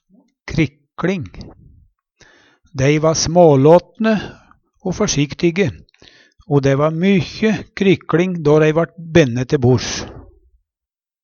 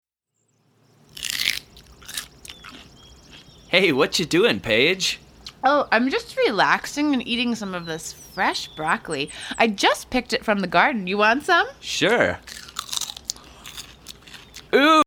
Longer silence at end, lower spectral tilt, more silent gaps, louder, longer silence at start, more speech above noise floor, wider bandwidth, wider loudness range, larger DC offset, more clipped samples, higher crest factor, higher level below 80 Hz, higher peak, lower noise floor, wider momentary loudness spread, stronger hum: first, 1.05 s vs 0 s; first, -6 dB/octave vs -3 dB/octave; neither; first, -16 LUFS vs -21 LUFS; second, 0.45 s vs 1.15 s; first, 74 dB vs 52 dB; second, 7.2 kHz vs over 20 kHz; about the same, 4 LU vs 5 LU; neither; neither; second, 16 dB vs 22 dB; first, -44 dBFS vs -54 dBFS; about the same, 0 dBFS vs -2 dBFS; first, -89 dBFS vs -72 dBFS; second, 14 LU vs 20 LU; neither